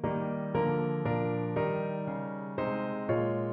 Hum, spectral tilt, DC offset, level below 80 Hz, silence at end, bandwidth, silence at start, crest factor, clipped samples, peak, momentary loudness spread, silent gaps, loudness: none; -11.5 dB/octave; under 0.1%; -60 dBFS; 0 s; 5.2 kHz; 0 s; 14 dB; under 0.1%; -18 dBFS; 5 LU; none; -32 LUFS